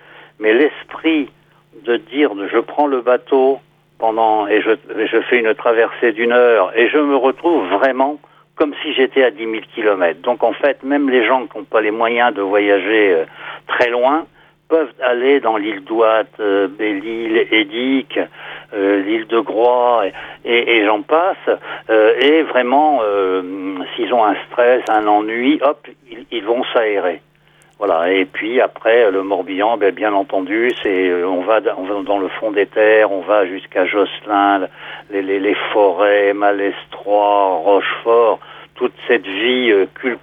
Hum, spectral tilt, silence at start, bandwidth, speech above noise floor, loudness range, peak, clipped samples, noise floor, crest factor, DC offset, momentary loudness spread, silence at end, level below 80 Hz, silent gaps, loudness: none; -6 dB/octave; 0.4 s; 5 kHz; 36 dB; 3 LU; 0 dBFS; under 0.1%; -51 dBFS; 14 dB; under 0.1%; 8 LU; 0.05 s; -64 dBFS; none; -15 LUFS